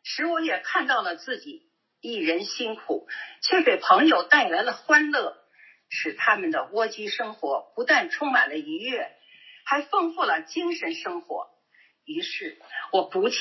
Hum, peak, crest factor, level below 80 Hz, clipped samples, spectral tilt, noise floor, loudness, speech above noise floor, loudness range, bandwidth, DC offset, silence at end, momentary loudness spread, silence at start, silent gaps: none; -2 dBFS; 24 dB; under -90 dBFS; under 0.1%; -2.5 dB/octave; -62 dBFS; -24 LUFS; 37 dB; 7 LU; 6.2 kHz; under 0.1%; 0 s; 15 LU; 0.05 s; none